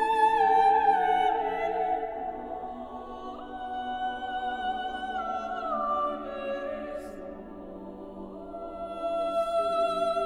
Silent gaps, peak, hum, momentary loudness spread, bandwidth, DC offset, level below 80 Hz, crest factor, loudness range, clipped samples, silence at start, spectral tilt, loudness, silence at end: none; -12 dBFS; none; 19 LU; 11 kHz; under 0.1%; -56 dBFS; 18 dB; 8 LU; under 0.1%; 0 s; -4.5 dB/octave; -28 LUFS; 0 s